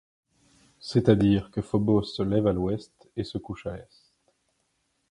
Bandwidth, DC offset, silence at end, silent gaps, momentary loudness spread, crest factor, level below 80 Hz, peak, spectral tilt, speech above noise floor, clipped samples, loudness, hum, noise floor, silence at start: 11 kHz; under 0.1%; 1.3 s; none; 16 LU; 22 dB; -50 dBFS; -6 dBFS; -8 dB/octave; 49 dB; under 0.1%; -26 LUFS; none; -74 dBFS; 0.85 s